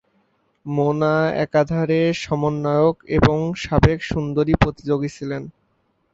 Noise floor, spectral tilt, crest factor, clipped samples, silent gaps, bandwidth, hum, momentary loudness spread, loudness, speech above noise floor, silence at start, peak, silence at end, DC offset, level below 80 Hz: -66 dBFS; -7.5 dB/octave; 20 dB; under 0.1%; none; 8 kHz; none; 9 LU; -20 LUFS; 47 dB; 0.65 s; 0 dBFS; 0.65 s; under 0.1%; -36 dBFS